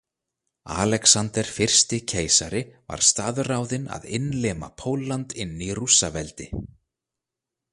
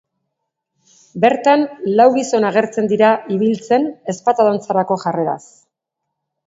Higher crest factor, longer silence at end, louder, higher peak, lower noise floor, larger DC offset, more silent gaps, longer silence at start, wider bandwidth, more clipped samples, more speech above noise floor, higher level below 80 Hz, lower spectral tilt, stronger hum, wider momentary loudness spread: first, 24 dB vs 16 dB; about the same, 1.05 s vs 1.1 s; second, -22 LUFS vs -16 LUFS; about the same, -2 dBFS vs 0 dBFS; first, -87 dBFS vs -78 dBFS; neither; neither; second, 0.65 s vs 1.15 s; first, 11.5 kHz vs 8 kHz; neither; about the same, 63 dB vs 63 dB; first, -48 dBFS vs -68 dBFS; second, -2.5 dB/octave vs -5.5 dB/octave; neither; first, 15 LU vs 8 LU